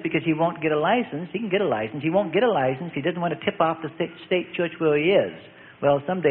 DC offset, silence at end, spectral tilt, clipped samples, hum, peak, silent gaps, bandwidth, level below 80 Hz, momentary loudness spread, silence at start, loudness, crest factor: under 0.1%; 0 s; -11 dB/octave; under 0.1%; none; -4 dBFS; none; 4.3 kHz; -62 dBFS; 8 LU; 0 s; -24 LUFS; 18 dB